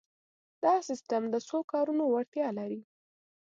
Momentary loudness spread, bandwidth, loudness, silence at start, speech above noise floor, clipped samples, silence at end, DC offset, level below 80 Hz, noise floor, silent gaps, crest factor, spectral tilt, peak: 8 LU; 7.8 kHz; -31 LUFS; 0.6 s; over 59 dB; under 0.1%; 0.6 s; under 0.1%; -86 dBFS; under -90 dBFS; 1.64-1.68 s, 2.28-2.32 s; 18 dB; -5.5 dB/octave; -14 dBFS